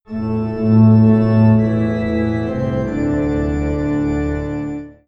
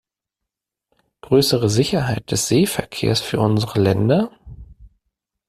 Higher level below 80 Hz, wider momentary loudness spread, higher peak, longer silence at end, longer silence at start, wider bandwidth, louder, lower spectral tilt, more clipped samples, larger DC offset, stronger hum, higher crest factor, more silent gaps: first, -32 dBFS vs -48 dBFS; first, 11 LU vs 5 LU; about the same, -2 dBFS vs -2 dBFS; second, 0.15 s vs 0.6 s; second, 0.1 s vs 1.3 s; second, 7.4 kHz vs 15 kHz; about the same, -16 LUFS vs -18 LUFS; first, -10 dB/octave vs -5 dB/octave; neither; neither; neither; about the same, 14 dB vs 18 dB; neither